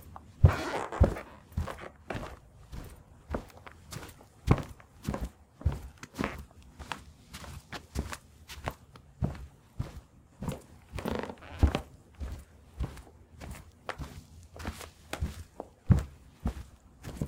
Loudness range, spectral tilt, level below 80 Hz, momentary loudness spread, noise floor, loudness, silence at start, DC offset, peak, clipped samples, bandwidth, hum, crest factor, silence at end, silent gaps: 7 LU; -6.5 dB/octave; -40 dBFS; 22 LU; -54 dBFS; -35 LUFS; 0 s; under 0.1%; -6 dBFS; under 0.1%; 16.5 kHz; none; 28 dB; 0 s; none